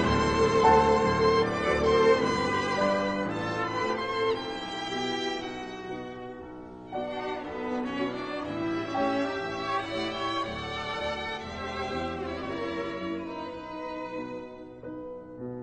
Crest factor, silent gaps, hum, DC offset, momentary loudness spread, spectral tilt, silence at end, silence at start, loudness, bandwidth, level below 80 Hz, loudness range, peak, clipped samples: 22 dB; none; none; under 0.1%; 17 LU; -5 dB/octave; 0 s; 0 s; -29 LUFS; 9.4 kHz; -48 dBFS; 10 LU; -8 dBFS; under 0.1%